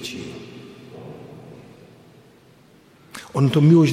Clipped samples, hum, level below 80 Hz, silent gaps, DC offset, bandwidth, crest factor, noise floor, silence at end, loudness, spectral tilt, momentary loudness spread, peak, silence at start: under 0.1%; none; -62 dBFS; none; under 0.1%; 13.5 kHz; 18 dB; -52 dBFS; 0 s; -18 LUFS; -7.5 dB/octave; 27 LU; -4 dBFS; 0 s